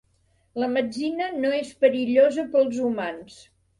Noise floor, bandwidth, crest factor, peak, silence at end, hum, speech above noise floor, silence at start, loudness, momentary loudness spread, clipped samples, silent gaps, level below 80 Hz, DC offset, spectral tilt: -65 dBFS; 11 kHz; 18 dB; -6 dBFS; 0.45 s; none; 42 dB; 0.55 s; -23 LUFS; 11 LU; under 0.1%; none; -66 dBFS; under 0.1%; -5 dB/octave